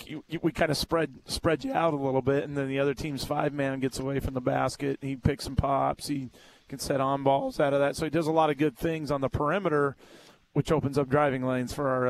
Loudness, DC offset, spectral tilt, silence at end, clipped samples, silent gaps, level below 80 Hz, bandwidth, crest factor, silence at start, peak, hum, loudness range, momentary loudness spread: -28 LUFS; under 0.1%; -6 dB/octave; 0 s; under 0.1%; none; -48 dBFS; 14 kHz; 18 dB; 0 s; -10 dBFS; none; 3 LU; 7 LU